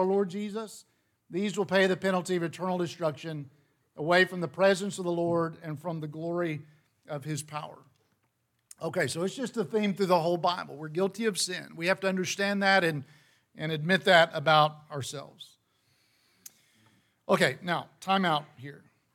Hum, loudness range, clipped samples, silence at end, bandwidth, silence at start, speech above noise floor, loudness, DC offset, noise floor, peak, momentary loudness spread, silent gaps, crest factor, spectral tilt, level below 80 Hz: none; 9 LU; under 0.1%; 0.35 s; 17 kHz; 0 s; 47 dB; -28 LUFS; under 0.1%; -75 dBFS; -8 dBFS; 16 LU; none; 22 dB; -4.5 dB/octave; -78 dBFS